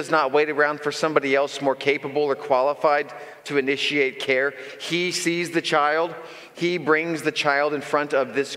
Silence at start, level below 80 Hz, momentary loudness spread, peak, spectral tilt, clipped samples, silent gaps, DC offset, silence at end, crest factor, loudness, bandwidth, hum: 0 s; -78 dBFS; 6 LU; -2 dBFS; -4 dB/octave; under 0.1%; none; under 0.1%; 0 s; 20 dB; -22 LUFS; 15.5 kHz; none